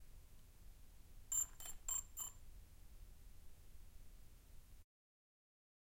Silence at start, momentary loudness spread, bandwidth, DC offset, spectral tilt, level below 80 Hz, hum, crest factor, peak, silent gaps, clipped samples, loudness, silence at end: 0 s; 25 LU; 16.5 kHz; under 0.1%; -0.5 dB/octave; -60 dBFS; none; 22 dB; -30 dBFS; none; under 0.1%; -44 LUFS; 1 s